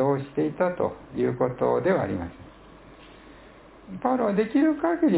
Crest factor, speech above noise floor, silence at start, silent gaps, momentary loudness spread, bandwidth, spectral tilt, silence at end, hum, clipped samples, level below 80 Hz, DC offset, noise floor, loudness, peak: 16 dB; 25 dB; 0 s; none; 8 LU; 4 kHz; -11.5 dB/octave; 0 s; none; under 0.1%; -54 dBFS; under 0.1%; -49 dBFS; -25 LUFS; -8 dBFS